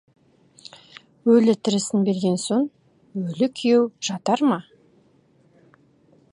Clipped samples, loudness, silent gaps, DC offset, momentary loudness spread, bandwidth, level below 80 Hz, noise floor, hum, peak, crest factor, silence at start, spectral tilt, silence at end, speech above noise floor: under 0.1%; -21 LUFS; none; under 0.1%; 13 LU; 11 kHz; -72 dBFS; -59 dBFS; none; -6 dBFS; 18 dB; 1.25 s; -5.5 dB/octave; 1.7 s; 38 dB